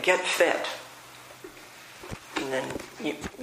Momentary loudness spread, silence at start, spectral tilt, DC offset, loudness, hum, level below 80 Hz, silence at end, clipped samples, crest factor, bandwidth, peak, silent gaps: 22 LU; 0 s; -2.5 dB/octave; under 0.1%; -28 LUFS; none; -58 dBFS; 0 s; under 0.1%; 24 dB; 15.5 kHz; -6 dBFS; none